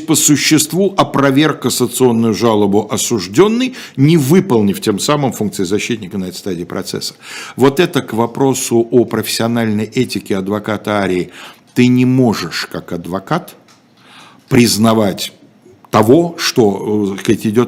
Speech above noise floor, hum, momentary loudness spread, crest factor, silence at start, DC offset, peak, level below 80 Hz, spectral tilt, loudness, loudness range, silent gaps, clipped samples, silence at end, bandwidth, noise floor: 33 dB; none; 11 LU; 14 dB; 0 s; under 0.1%; 0 dBFS; -52 dBFS; -5 dB/octave; -14 LUFS; 4 LU; none; 0.1%; 0 s; 16.5 kHz; -46 dBFS